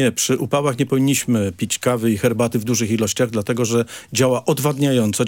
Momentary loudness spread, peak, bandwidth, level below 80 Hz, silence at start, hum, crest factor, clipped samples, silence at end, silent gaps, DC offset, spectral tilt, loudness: 3 LU; -4 dBFS; 17 kHz; -58 dBFS; 0 s; none; 14 dB; under 0.1%; 0 s; none; under 0.1%; -5 dB/octave; -19 LUFS